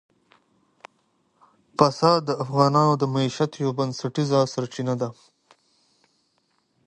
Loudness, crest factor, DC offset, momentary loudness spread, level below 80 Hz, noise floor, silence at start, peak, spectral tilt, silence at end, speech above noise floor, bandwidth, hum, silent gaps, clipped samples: -23 LUFS; 22 dB; under 0.1%; 9 LU; -66 dBFS; -69 dBFS; 1.8 s; -2 dBFS; -6.5 dB/octave; 1.75 s; 47 dB; 10 kHz; none; none; under 0.1%